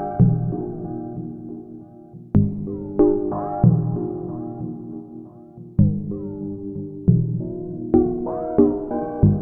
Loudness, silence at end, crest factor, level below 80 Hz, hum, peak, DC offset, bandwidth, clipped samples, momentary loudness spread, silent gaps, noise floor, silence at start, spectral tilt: -22 LUFS; 0 s; 20 dB; -40 dBFS; none; -2 dBFS; under 0.1%; 2 kHz; under 0.1%; 18 LU; none; -42 dBFS; 0 s; -15 dB/octave